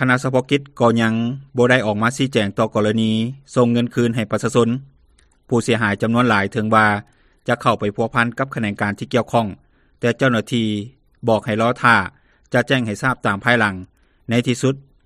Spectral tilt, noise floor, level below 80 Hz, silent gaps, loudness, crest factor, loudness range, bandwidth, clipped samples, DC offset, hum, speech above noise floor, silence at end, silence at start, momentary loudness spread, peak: -6 dB/octave; -55 dBFS; -52 dBFS; none; -18 LUFS; 18 dB; 2 LU; 13 kHz; under 0.1%; under 0.1%; none; 37 dB; 0.25 s; 0 s; 8 LU; 0 dBFS